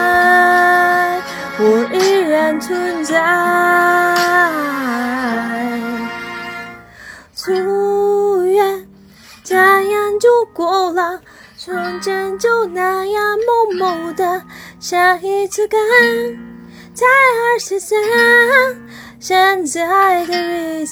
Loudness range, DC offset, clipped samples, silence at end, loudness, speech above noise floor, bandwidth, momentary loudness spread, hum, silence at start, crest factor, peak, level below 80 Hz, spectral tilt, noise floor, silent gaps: 5 LU; under 0.1%; under 0.1%; 0 s; -14 LUFS; 27 dB; over 20 kHz; 14 LU; none; 0 s; 14 dB; 0 dBFS; -56 dBFS; -3 dB/octave; -42 dBFS; none